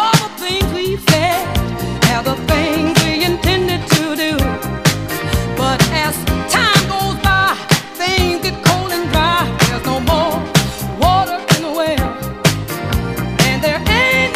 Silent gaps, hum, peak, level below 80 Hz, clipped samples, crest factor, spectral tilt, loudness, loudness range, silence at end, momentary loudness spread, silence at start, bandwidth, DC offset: none; none; 0 dBFS; -28 dBFS; under 0.1%; 16 dB; -4.5 dB/octave; -15 LUFS; 2 LU; 0 s; 6 LU; 0 s; 15.5 kHz; 0.4%